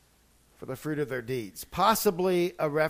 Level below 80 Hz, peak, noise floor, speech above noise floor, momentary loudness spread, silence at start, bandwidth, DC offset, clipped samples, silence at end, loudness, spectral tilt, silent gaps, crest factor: -58 dBFS; -8 dBFS; -63 dBFS; 35 dB; 14 LU; 0.6 s; 15.5 kHz; under 0.1%; under 0.1%; 0 s; -28 LUFS; -4.5 dB/octave; none; 20 dB